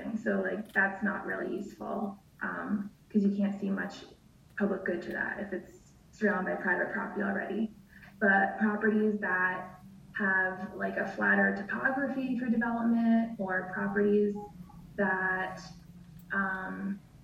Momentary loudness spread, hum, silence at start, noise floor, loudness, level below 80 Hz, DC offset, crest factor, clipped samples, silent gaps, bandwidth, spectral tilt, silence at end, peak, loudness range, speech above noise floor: 12 LU; none; 0 s; -51 dBFS; -31 LUFS; -64 dBFS; under 0.1%; 18 dB; under 0.1%; none; 7.6 kHz; -7.5 dB/octave; 0 s; -14 dBFS; 4 LU; 20 dB